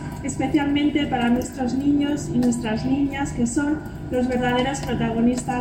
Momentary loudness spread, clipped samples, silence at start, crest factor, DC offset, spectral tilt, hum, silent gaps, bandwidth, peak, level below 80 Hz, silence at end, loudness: 4 LU; under 0.1%; 0 s; 12 dB; under 0.1%; -5.5 dB/octave; none; none; 16.5 kHz; -8 dBFS; -40 dBFS; 0 s; -22 LUFS